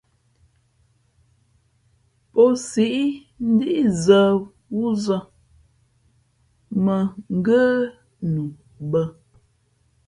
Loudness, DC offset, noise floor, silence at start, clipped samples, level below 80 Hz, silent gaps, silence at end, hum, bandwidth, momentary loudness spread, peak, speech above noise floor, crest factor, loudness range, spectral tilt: -21 LUFS; under 0.1%; -64 dBFS; 2.35 s; under 0.1%; -58 dBFS; none; 0.95 s; none; 11.5 kHz; 13 LU; -2 dBFS; 44 dB; 20 dB; 4 LU; -6.5 dB/octave